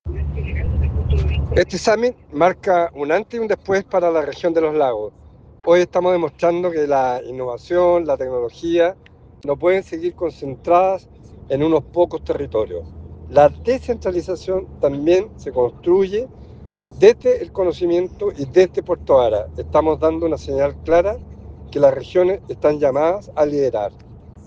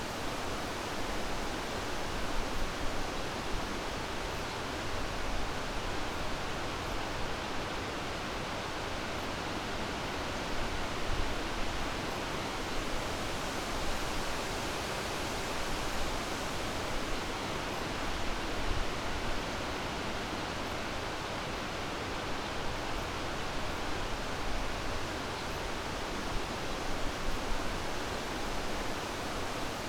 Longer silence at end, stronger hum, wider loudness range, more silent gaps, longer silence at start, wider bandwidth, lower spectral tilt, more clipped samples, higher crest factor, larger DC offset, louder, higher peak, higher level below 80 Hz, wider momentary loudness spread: about the same, 0.05 s vs 0 s; neither; about the same, 2 LU vs 1 LU; neither; about the same, 0.05 s vs 0 s; second, 7.8 kHz vs 18 kHz; first, -7 dB/octave vs -3.5 dB/octave; neither; about the same, 18 dB vs 16 dB; neither; first, -19 LUFS vs -36 LUFS; first, 0 dBFS vs -20 dBFS; first, -34 dBFS vs -42 dBFS; first, 10 LU vs 1 LU